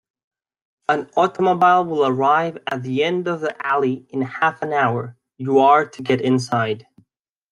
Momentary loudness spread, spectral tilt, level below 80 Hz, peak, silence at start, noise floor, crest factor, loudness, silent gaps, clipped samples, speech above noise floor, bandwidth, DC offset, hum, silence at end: 11 LU; -6 dB/octave; -66 dBFS; -2 dBFS; 0.9 s; -67 dBFS; 18 dB; -19 LUFS; none; under 0.1%; 49 dB; 11 kHz; under 0.1%; none; 0.7 s